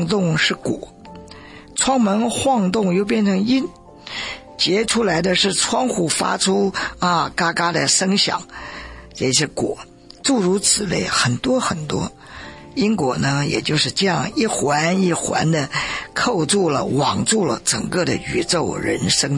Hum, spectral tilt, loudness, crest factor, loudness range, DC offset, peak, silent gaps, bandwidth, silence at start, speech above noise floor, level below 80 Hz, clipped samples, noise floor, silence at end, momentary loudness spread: none; -3.5 dB/octave; -18 LUFS; 16 dB; 2 LU; under 0.1%; -4 dBFS; none; 11.5 kHz; 0 s; 21 dB; -48 dBFS; under 0.1%; -40 dBFS; 0 s; 13 LU